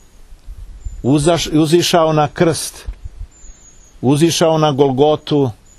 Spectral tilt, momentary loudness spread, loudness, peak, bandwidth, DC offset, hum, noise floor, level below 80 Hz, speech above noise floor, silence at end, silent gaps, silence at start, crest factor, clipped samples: -5.5 dB/octave; 21 LU; -14 LUFS; 0 dBFS; 13.5 kHz; under 0.1%; none; -42 dBFS; -36 dBFS; 29 dB; 0.25 s; none; 0.3 s; 16 dB; under 0.1%